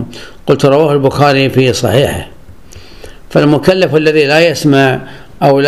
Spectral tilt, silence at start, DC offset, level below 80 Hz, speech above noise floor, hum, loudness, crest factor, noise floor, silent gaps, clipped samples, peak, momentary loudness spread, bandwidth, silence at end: -6 dB/octave; 0 s; 1%; -38 dBFS; 26 dB; none; -10 LUFS; 10 dB; -35 dBFS; none; 0.6%; 0 dBFS; 7 LU; 15 kHz; 0 s